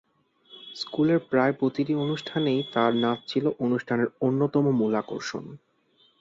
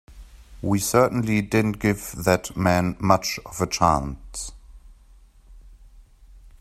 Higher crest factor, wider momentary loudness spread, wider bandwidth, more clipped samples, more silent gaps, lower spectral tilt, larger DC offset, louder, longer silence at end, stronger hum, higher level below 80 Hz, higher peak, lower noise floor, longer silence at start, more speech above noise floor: second, 18 dB vs 24 dB; about the same, 11 LU vs 13 LU; second, 7.8 kHz vs 16 kHz; neither; neither; first, -7 dB/octave vs -5 dB/octave; neither; second, -26 LUFS vs -23 LUFS; first, 0.65 s vs 0.1 s; neither; second, -68 dBFS vs -44 dBFS; second, -8 dBFS vs -2 dBFS; first, -64 dBFS vs -51 dBFS; first, 0.5 s vs 0.1 s; first, 39 dB vs 29 dB